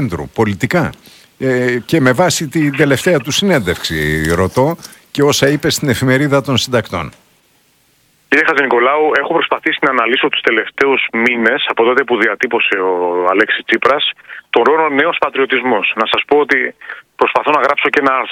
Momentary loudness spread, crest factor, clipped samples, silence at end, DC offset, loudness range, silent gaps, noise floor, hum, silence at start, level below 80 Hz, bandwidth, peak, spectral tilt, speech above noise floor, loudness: 6 LU; 14 dB; 0.1%; 0 s; under 0.1%; 2 LU; none; -55 dBFS; none; 0 s; -42 dBFS; 17 kHz; 0 dBFS; -4.5 dB/octave; 41 dB; -13 LUFS